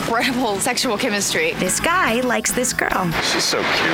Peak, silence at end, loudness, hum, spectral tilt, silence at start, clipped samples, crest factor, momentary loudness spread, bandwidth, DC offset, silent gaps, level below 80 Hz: -2 dBFS; 0 s; -18 LUFS; none; -2.5 dB/octave; 0 s; under 0.1%; 18 dB; 2 LU; over 20 kHz; under 0.1%; none; -44 dBFS